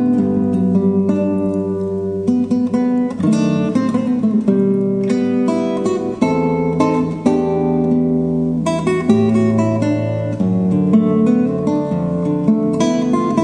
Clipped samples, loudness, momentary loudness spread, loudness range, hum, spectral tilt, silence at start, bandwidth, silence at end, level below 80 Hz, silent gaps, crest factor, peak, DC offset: under 0.1%; -16 LUFS; 4 LU; 1 LU; none; -8 dB/octave; 0 s; 9.8 kHz; 0 s; -48 dBFS; none; 16 dB; 0 dBFS; under 0.1%